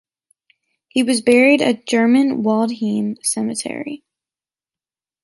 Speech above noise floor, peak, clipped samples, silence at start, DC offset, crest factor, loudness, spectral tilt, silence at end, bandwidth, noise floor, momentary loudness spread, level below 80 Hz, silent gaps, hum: over 74 dB; -2 dBFS; under 0.1%; 0.95 s; under 0.1%; 16 dB; -17 LUFS; -4 dB/octave; 1.3 s; 12 kHz; under -90 dBFS; 14 LU; -66 dBFS; none; none